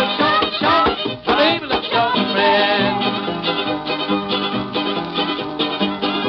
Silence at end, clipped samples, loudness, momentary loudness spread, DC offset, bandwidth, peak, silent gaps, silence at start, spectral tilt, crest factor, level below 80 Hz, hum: 0 s; under 0.1%; -18 LUFS; 6 LU; under 0.1%; 6 kHz; -4 dBFS; none; 0 s; -6.5 dB/octave; 14 dB; -48 dBFS; none